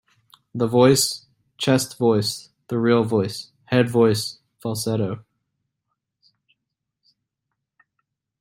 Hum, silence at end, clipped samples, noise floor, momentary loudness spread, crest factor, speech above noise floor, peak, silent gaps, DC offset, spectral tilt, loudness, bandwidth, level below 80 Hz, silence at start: none; 3.2 s; under 0.1%; -81 dBFS; 17 LU; 20 dB; 61 dB; -2 dBFS; none; under 0.1%; -5 dB/octave; -21 LUFS; 16 kHz; -62 dBFS; 0.55 s